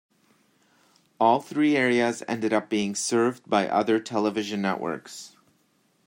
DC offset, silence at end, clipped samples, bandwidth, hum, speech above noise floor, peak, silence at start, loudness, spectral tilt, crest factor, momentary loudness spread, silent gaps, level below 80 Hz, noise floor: under 0.1%; 0.8 s; under 0.1%; 16 kHz; none; 42 dB; -6 dBFS; 1.2 s; -25 LUFS; -4.5 dB/octave; 20 dB; 10 LU; none; -72 dBFS; -67 dBFS